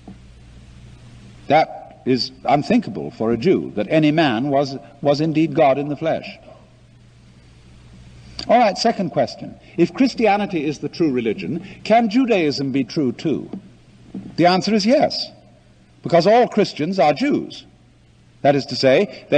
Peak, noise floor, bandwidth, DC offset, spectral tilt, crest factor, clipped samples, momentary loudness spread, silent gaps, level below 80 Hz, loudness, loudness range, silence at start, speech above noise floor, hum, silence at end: -2 dBFS; -51 dBFS; 9.4 kHz; under 0.1%; -6 dB/octave; 16 dB; under 0.1%; 14 LU; none; -52 dBFS; -18 LUFS; 4 LU; 0.05 s; 33 dB; none; 0 s